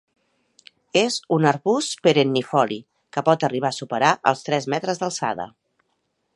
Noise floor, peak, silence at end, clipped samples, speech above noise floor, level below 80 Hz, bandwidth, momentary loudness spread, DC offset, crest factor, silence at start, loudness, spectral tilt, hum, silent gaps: -72 dBFS; -2 dBFS; 0.85 s; under 0.1%; 51 dB; -70 dBFS; 11.5 kHz; 8 LU; under 0.1%; 22 dB; 0.95 s; -21 LUFS; -4.5 dB/octave; none; none